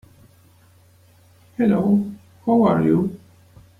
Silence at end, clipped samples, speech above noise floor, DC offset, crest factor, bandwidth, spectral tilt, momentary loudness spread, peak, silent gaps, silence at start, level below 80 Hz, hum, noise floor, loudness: 0.65 s; under 0.1%; 36 dB; under 0.1%; 18 dB; 4.3 kHz; -9.5 dB/octave; 13 LU; -4 dBFS; none; 1.6 s; -56 dBFS; none; -53 dBFS; -19 LUFS